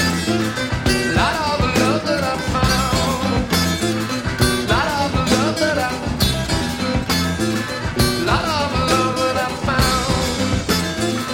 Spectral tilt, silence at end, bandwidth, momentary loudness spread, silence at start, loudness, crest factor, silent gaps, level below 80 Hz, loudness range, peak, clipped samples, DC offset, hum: -4.5 dB/octave; 0 s; 17.5 kHz; 4 LU; 0 s; -18 LUFS; 16 dB; none; -30 dBFS; 1 LU; -2 dBFS; under 0.1%; under 0.1%; none